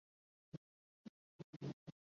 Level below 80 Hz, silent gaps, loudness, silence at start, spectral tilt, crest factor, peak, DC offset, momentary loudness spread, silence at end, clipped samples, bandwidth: -86 dBFS; 0.57-1.60 s, 1.73-1.86 s; -56 LUFS; 0.55 s; -8 dB/octave; 20 dB; -36 dBFS; under 0.1%; 12 LU; 0.25 s; under 0.1%; 7.2 kHz